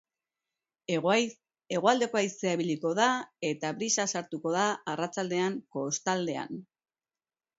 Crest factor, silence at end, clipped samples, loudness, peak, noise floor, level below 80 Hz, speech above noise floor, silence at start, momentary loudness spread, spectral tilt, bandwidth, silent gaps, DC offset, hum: 22 dB; 0.95 s; under 0.1%; -30 LUFS; -10 dBFS; under -90 dBFS; -80 dBFS; over 60 dB; 0.9 s; 9 LU; -3.5 dB/octave; 8 kHz; none; under 0.1%; none